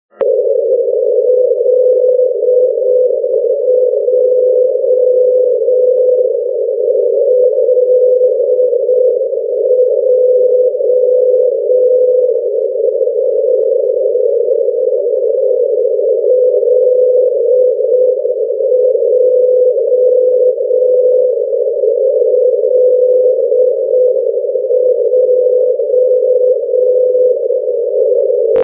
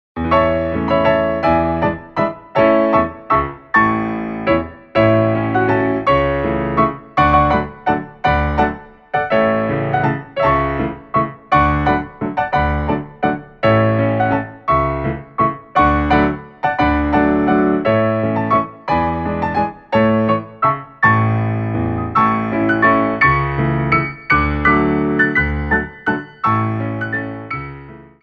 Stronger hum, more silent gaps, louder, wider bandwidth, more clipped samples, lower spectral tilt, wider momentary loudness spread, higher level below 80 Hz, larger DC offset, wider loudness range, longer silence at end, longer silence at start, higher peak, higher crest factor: neither; neither; first, -11 LUFS vs -16 LUFS; second, 1.3 kHz vs 6.6 kHz; neither; about the same, -9 dB/octave vs -9 dB/octave; second, 4 LU vs 7 LU; second, -72 dBFS vs -32 dBFS; neither; about the same, 1 LU vs 2 LU; second, 0 s vs 0.2 s; about the same, 0.2 s vs 0.15 s; about the same, -2 dBFS vs -2 dBFS; second, 8 dB vs 16 dB